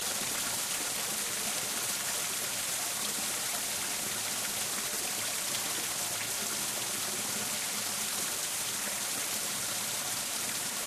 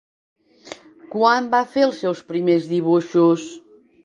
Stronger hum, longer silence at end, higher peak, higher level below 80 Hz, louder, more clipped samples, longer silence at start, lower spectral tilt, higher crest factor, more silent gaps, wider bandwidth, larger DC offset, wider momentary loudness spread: neither; second, 0 s vs 0.45 s; second, -18 dBFS vs -2 dBFS; about the same, -68 dBFS vs -70 dBFS; second, -31 LUFS vs -19 LUFS; neither; second, 0 s vs 0.65 s; second, 0 dB/octave vs -6 dB/octave; about the same, 16 dB vs 18 dB; neither; first, 15.5 kHz vs 7.6 kHz; neither; second, 1 LU vs 22 LU